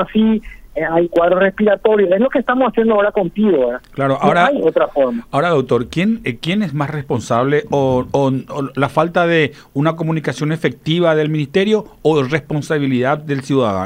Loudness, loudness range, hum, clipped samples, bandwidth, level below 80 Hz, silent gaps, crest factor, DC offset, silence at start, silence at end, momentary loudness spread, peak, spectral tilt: -16 LUFS; 3 LU; none; under 0.1%; 15.5 kHz; -46 dBFS; none; 14 dB; under 0.1%; 0 s; 0 s; 6 LU; 0 dBFS; -7 dB/octave